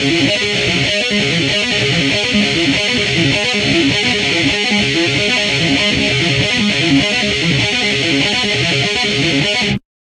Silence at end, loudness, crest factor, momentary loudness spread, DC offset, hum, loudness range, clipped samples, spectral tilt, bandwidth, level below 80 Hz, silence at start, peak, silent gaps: 0.25 s; -13 LUFS; 14 dB; 1 LU; under 0.1%; none; 0 LU; under 0.1%; -3.5 dB/octave; 11.5 kHz; -38 dBFS; 0 s; 0 dBFS; none